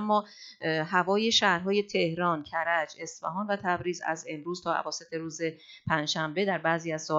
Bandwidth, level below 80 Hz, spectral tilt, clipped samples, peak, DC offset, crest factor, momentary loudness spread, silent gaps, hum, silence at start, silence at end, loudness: 8 kHz; -68 dBFS; -4 dB/octave; under 0.1%; -10 dBFS; under 0.1%; 20 dB; 11 LU; none; none; 0 s; 0 s; -29 LUFS